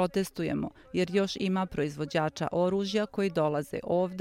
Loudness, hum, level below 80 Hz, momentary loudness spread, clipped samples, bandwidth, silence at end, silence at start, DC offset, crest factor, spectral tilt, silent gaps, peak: -30 LUFS; none; -58 dBFS; 5 LU; under 0.1%; 15.5 kHz; 0 s; 0 s; under 0.1%; 16 dB; -6 dB/octave; none; -14 dBFS